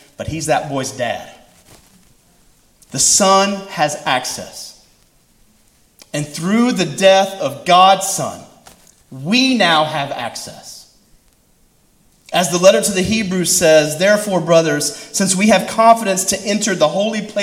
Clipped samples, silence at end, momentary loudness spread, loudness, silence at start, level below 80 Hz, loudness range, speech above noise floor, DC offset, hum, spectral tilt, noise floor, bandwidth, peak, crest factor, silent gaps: under 0.1%; 0 s; 16 LU; -14 LUFS; 0.2 s; -50 dBFS; 6 LU; 40 dB; under 0.1%; none; -3 dB/octave; -55 dBFS; 16.5 kHz; 0 dBFS; 16 dB; none